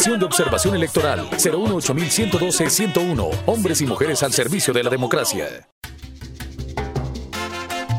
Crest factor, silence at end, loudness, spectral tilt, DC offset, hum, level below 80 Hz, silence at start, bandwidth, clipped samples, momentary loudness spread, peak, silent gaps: 18 dB; 0 s; -20 LUFS; -3.5 dB/octave; under 0.1%; none; -40 dBFS; 0 s; 16.5 kHz; under 0.1%; 16 LU; -4 dBFS; 5.72-5.82 s